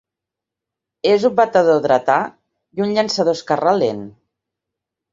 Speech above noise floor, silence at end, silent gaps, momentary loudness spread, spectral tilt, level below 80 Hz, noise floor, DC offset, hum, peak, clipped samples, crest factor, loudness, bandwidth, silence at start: 69 dB; 1 s; none; 9 LU; -5 dB/octave; -62 dBFS; -85 dBFS; under 0.1%; none; 0 dBFS; under 0.1%; 18 dB; -17 LUFS; 7.8 kHz; 1.05 s